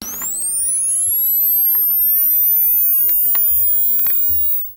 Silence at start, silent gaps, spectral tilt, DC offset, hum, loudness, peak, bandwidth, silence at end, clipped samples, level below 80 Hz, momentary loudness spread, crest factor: 0 s; none; 0 dB/octave; under 0.1%; 50 Hz at -55 dBFS; -12 LUFS; -6 dBFS; 17.5 kHz; 0 s; under 0.1%; -50 dBFS; 4 LU; 10 dB